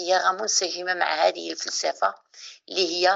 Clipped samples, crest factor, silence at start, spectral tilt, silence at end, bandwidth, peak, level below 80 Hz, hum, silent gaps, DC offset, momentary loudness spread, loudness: under 0.1%; 18 dB; 0 s; 0 dB/octave; 0 s; 8.2 kHz; -8 dBFS; -90 dBFS; none; none; under 0.1%; 12 LU; -24 LUFS